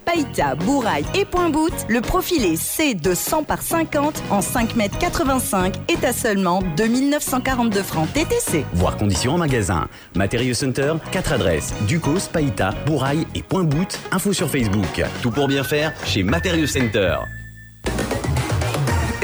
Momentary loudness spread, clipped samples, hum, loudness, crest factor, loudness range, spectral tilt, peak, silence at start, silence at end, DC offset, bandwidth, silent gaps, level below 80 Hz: 4 LU; under 0.1%; none; -20 LUFS; 14 dB; 1 LU; -5 dB/octave; -6 dBFS; 0 s; 0 s; under 0.1%; over 20 kHz; none; -36 dBFS